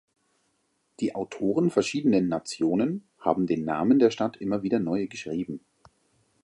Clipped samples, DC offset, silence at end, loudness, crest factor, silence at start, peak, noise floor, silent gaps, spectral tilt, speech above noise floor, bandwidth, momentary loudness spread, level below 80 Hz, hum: under 0.1%; under 0.1%; 0.85 s; -26 LUFS; 20 dB; 1 s; -6 dBFS; -73 dBFS; none; -6.5 dB/octave; 47 dB; 11 kHz; 10 LU; -64 dBFS; none